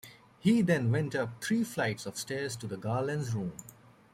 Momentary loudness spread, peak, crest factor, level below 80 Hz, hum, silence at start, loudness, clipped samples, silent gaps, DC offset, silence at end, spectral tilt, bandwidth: 10 LU; -14 dBFS; 18 dB; -68 dBFS; none; 0.05 s; -32 LUFS; under 0.1%; none; under 0.1%; 0.4 s; -6 dB/octave; 16 kHz